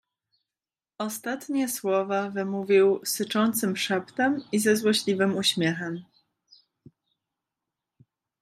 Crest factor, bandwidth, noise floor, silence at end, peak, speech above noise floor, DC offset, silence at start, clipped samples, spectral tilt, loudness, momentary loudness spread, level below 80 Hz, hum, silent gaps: 18 dB; 15.5 kHz; under -90 dBFS; 2.4 s; -10 dBFS; over 65 dB; under 0.1%; 1 s; under 0.1%; -4 dB/octave; -25 LUFS; 11 LU; -76 dBFS; none; none